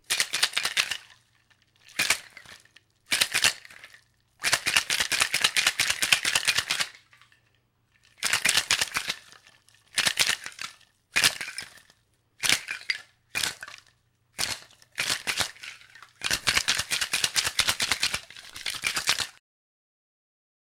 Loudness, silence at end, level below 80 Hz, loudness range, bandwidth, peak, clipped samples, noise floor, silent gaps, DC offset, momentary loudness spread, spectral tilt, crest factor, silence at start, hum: -25 LUFS; 1.5 s; -58 dBFS; 6 LU; 17 kHz; 0 dBFS; under 0.1%; -68 dBFS; none; under 0.1%; 14 LU; 1 dB/octave; 30 dB; 0.1 s; none